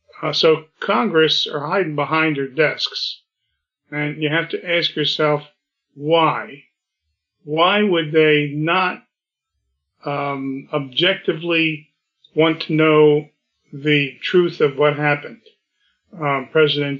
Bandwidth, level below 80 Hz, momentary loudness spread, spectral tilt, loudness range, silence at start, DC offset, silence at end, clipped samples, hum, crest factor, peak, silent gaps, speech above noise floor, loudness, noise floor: 7.2 kHz; -74 dBFS; 11 LU; -6 dB/octave; 4 LU; 0.2 s; under 0.1%; 0 s; under 0.1%; none; 16 dB; -4 dBFS; none; 62 dB; -18 LUFS; -80 dBFS